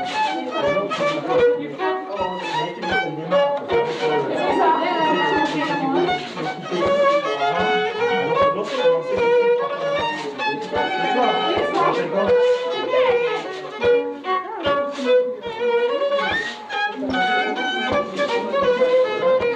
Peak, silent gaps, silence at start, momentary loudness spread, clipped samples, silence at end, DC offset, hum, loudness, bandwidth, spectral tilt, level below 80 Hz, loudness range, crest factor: -8 dBFS; none; 0 s; 6 LU; under 0.1%; 0 s; under 0.1%; none; -20 LUFS; 8.8 kHz; -5 dB/octave; -56 dBFS; 2 LU; 14 dB